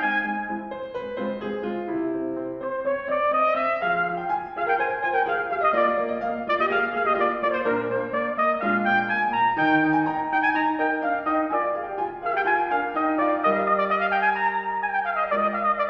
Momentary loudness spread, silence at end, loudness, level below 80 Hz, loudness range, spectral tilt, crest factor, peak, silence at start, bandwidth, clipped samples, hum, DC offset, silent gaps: 8 LU; 0 s; -24 LUFS; -60 dBFS; 3 LU; -7.5 dB/octave; 16 dB; -8 dBFS; 0 s; 6 kHz; under 0.1%; none; under 0.1%; none